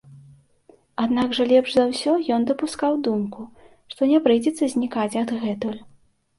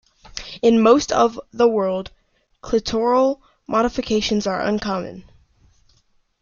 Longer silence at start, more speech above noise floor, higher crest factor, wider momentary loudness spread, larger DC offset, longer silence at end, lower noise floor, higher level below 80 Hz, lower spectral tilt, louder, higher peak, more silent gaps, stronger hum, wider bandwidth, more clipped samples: second, 0.1 s vs 0.35 s; second, 35 dB vs 43 dB; about the same, 16 dB vs 18 dB; second, 14 LU vs 17 LU; neither; second, 0.55 s vs 1.2 s; second, -56 dBFS vs -61 dBFS; second, -62 dBFS vs -46 dBFS; about the same, -5 dB/octave vs -5 dB/octave; second, -22 LUFS vs -19 LUFS; second, -6 dBFS vs -2 dBFS; neither; neither; first, 11.5 kHz vs 7.2 kHz; neither